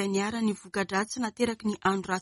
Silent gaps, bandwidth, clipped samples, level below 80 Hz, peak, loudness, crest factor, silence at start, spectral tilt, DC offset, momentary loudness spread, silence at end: none; 11.5 kHz; under 0.1%; -62 dBFS; -12 dBFS; -29 LUFS; 16 dB; 0 s; -4.5 dB/octave; under 0.1%; 3 LU; 0 s